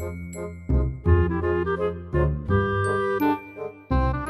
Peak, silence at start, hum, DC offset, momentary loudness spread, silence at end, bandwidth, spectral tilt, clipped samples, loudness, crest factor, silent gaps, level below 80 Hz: -8 dBFS; 0 s; none; under 0.1%; 13 LU; 0 s; 13 kHz; -8 dB/octave; under 0.1%; -25 LUFS; 16 dB; none; -30 dBFS